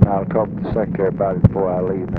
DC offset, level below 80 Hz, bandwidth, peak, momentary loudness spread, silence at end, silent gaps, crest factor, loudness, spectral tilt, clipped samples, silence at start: under 0.1%; -34 dBFS; 4.5 kHz; 0 dBFS; 5 LU; 0 s; none; 16 dB; -19 LUFS; -12 dB/octave; under 0.1%; 0 s